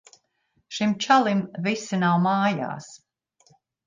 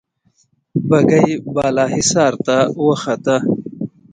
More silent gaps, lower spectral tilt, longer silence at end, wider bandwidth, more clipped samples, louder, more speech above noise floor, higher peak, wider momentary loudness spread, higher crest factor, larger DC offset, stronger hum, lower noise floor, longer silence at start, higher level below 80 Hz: neither; about the same, -5.5 dB/octave vs -5 dB/octave; first, 0.9 s vs 0.25 s; about the same, 9.6 kHz vs 9.6 kHz; neither; second, -23 LUFS vs -16 LUFS; about the same, 48 dB vs 46 dB; second, -6 dBFS vs 0 dBFS; first, 13 LU vs 10 LU; about the same, 20 dB vs 16 dB; neither; neither; first, -71 dBFS vs -60 dBFS; about the same, 0.7 s vs 0.75 s; second, -70 dBFS vs -52 dBFS